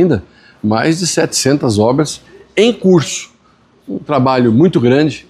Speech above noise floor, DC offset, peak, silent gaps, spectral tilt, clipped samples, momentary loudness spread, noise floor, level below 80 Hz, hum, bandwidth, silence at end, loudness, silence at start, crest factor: 38 dB; under 0.1%; 0 dBFS; none; -5 dB/octave; under 0.1%; 11 LU; -50 dBFS; -48 dBFS; none; 14.5 kHz; 0.1 s; -13 LUFS; 0 s; 12 dB